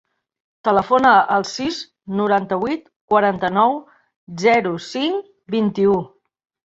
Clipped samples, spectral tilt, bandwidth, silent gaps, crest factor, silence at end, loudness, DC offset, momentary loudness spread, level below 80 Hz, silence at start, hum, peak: under 0.1%; -5.5 dB/octave; 8 kHz; 2.96-3.08 s, 4.16-4.27 s; 18 dB; 0.6 s; -18 LUFS; under 0.1%; 13 LU; -58 dBFS; 0.65 s; none; -2 dBFS